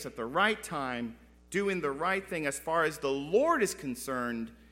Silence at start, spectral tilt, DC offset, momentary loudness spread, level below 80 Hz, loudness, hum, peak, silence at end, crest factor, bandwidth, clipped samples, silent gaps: 0 s; -4 dB/octave; under 0.1%; 8 LU; -60 dBFS; -31 LUFS; none; -12 dBFS; 0.15 s; 20 dB; 16 kHz; under 0.1%; none